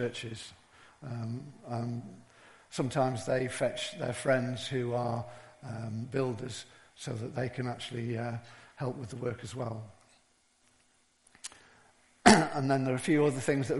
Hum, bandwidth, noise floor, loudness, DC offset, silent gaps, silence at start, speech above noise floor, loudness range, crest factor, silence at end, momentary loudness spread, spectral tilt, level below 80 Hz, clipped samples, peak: none; 11.5 kHz; -69 dBFS; -32 LUFS; under 0.1%; none; 0 s; 36 dB; 11 LU; 34 dB; 0 s; 19 LU; -5 dB/octave; -64 dBFS; under 0.1%; 0 dBFS